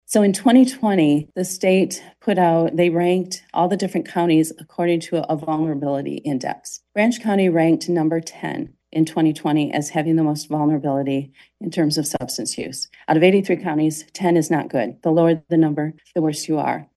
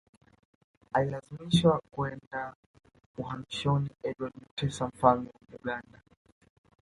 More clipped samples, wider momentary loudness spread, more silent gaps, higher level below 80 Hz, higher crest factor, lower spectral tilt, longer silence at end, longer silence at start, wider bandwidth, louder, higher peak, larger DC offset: neither; second, 10 LU vs 15 LU; second, none vs 2.27-2.31 s, 2.55-2.74 s, 3.06-3.14 s, 4.51-4.57 s; second, -64 dBFS vs -58 dBFS; second, 16 dB vs 24 dB; about the same, -5.5 dB/octave vs -6.5 dB/octave; second, 0.1 s vs 1 s; second, 0.1 s vs 0.95 s; about the same, 12.5 kHz vs 11.5 kHz; first, -20 LUFS vs -31 LUFS; first, -2 dBFS vs -8 dBFS; neither